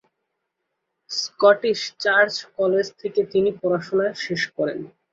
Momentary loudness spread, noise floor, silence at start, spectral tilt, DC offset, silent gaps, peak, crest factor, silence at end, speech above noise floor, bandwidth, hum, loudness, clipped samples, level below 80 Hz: 10 LU; -78 dBFS; 1.1 s; -4 dB/octave; under 0.1%; none; -2 dBFS; 20 dB; 0.25 s; 57 dB; 7.8 kHz; none; -21 LUFS; under 0.1%; -66 dBFS